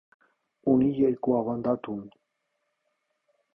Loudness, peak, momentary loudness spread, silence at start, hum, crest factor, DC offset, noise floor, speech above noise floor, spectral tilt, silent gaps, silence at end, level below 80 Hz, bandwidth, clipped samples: -26 LUFS; -10 dBFS; 12 LU; 0.65 s; none; 18 dB; under 0.1%; -78 dBFS; 53 dB; -11.5 dB/octave; none; 1.45 s; -62 dBFS; 3.6 kHz; under 0.1%